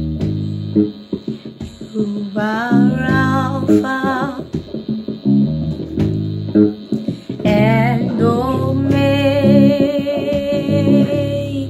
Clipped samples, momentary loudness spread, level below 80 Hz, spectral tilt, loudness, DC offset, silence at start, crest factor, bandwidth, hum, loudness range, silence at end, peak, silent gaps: under 0.1%; 12 LU; -40 dBFS; -8 dB/octave; -16 LUFS; under 0.1%; 0 s; 16 dB; 13 kHz; none; 4 LU; 0 s; 0 dBFS; none